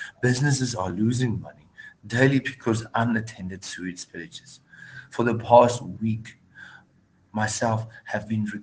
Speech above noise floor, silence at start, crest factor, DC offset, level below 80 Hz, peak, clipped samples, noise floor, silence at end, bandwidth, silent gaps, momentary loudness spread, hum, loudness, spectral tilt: 37 dB; 0 s; 24 dB; under 0.1%; -60 dBFS; -2 dBFS; under 0.1%; -61 dBFS; 0 s; 10 kHz; none; 23 LU; none; -25 LUFS; -5.5 dB/octave